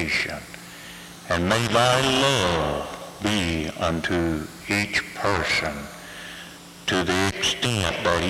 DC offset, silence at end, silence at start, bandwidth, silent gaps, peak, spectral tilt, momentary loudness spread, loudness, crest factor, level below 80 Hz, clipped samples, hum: under 0.1%; 0 s; 0 s; 16.5 kHz; none; -8 dBFS; -4 dB/octave; 18 LU; -23 LUFS; 16 dB; -46 dBFS; under 0.1%; none